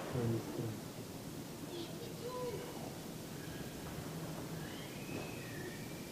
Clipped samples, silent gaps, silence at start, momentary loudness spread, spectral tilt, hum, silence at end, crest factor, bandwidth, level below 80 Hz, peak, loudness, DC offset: under 0.1%; none; 0 s; 7 LU; -5 dB/octave; none; 0 s; 18 dB; 15.5 kHz; -64 dBFS; -26 dBFS; -44 LUFS; under 0.1%